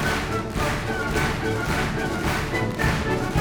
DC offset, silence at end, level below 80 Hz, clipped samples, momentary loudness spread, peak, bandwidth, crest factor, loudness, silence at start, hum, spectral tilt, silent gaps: under 0.1%; 0 s; -34 dBFS; under 0.1%; 2 LU; -8 dBFS; over 20 kHz; 16 dB; -24 LUFS; 0 s; none; -5 dB/octave; none